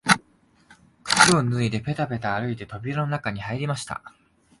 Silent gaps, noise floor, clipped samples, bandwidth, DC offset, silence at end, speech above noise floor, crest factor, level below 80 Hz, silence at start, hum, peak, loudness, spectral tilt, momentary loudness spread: none; -60 dBFS; under 0.1%; 12 kHz; under 0.1%; 0.5 s; 34 dB; 24 dB; -54 dBFS; 0.05 s; none; 0 dBFS; -23 LUFS; -4 dB/octave; 15 LU